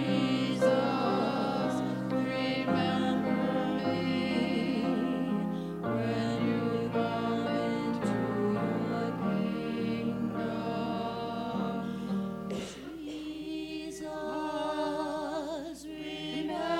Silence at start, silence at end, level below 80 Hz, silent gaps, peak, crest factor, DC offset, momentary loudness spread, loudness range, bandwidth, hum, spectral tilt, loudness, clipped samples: 0 s; 0 s; -62 dBFS; none; -14 dBFS; 18 dB; under 0.1%; 9 LU; 6 LU; 16 kHz; none; -6.5 dB/octave; -32 LUFS; under 0.1%